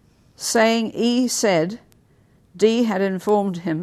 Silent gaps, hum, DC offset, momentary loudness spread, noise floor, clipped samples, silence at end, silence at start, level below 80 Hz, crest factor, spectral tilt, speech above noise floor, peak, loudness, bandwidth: none; none; under 0.1%; 8 LU; -56 dBFS; under 0.1%; 0 s; 0.4 s; -64 dBFS; 16 dB; -4 dB/octave; 37 dB; -4 dBFS; -20 LUFS; 14 kHz